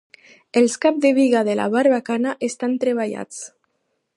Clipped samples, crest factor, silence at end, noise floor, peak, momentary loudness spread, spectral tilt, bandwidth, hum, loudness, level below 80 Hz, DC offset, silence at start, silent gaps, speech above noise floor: under 0.1%; 16 dB; 0.7 s; -72 dBFS; -4 dBFS; 13 LU; -4.5 dB/octave; 11.5 kHz; none; -19 LUFS; -74 dBFS; under 0.1%; 0.55 s; none; 53 dB